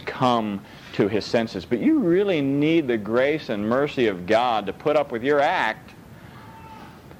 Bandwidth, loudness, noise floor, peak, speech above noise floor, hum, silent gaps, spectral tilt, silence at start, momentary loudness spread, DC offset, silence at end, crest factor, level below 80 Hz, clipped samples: 15.5 kHz; -22 LUFS; -43 dBFS; -6 dBFS; 22 dB; none; none; -6.5 dB/octave; 0 s; 15 LU; under 0.1%; 0.05 s; 18 dB; -56 dBFS; under 0.1%